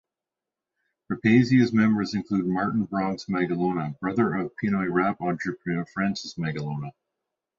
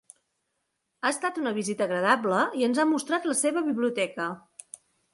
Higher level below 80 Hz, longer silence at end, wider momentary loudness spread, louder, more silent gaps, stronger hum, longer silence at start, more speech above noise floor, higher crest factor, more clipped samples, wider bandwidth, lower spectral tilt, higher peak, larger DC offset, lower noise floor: first, -60 dBFS vs -76 dBFS; about the same, 0.7 s vs 0.75 s; second, 10 LU vs 19 LU; about the same, -25 LUFS vs -26 LUFS; neither; neither; about the same, 1.1 s vs 1.05 s; first, 64 dB vs 53 dB; about the same, 18 dB vs 20 dB; neither; second, 7.6 kHz vs 11.5 kHz; first, -7 dB/octave vs -3.5 dB/octave; about the same, -6 dBFS vs -8 dBFS; neither; first, -88 dBFS vs -79 dBFS